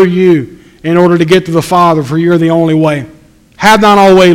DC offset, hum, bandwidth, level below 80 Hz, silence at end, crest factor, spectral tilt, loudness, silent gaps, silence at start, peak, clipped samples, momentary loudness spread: under 0.1%; none; 16.5 kHz; -40 dBFS; 0 s; 8 dB; -6 dB/octave; -8 LUFS; none; 0 s; 0 dBFS; 2%; 8 LU